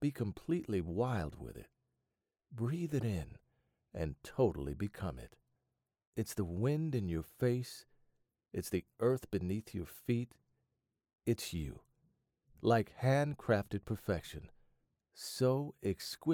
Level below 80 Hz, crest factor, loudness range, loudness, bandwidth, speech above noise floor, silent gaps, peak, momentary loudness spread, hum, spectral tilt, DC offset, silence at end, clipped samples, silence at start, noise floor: -58 dBFS; 20 dB; 5 LU; -37 LUFS; 19 kHz; 53 dB; 6.07-6.13 s; -18 dBFS; 14 LU; none; -6.5 dB/octave; under 0.1%; 0 s; under 0.1%; 0 s; -89 dBFS